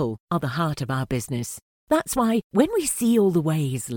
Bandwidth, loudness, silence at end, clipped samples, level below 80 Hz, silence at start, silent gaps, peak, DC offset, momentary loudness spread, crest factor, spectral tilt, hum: 18 kHz; -23 LUFS; 0 s; under 0.1%; -50 dBFS; 0 s; 0.20-0.27 s, 1.62-1.87 s, 2.44-2.50 s; -4 dBFS; under 0.1%; 9 LU; 18 dB; -5.5 dB/octave; none